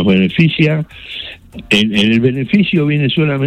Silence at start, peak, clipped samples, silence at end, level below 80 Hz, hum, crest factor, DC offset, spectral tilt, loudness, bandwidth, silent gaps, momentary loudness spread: 0 s; 0 dBFS; under 0.1%; 0 s; -44 dBFS; none; 12 dB; under 0.1%; -6.5 dB/octave; -13 LUFS; 10 kHz; none; 14 LU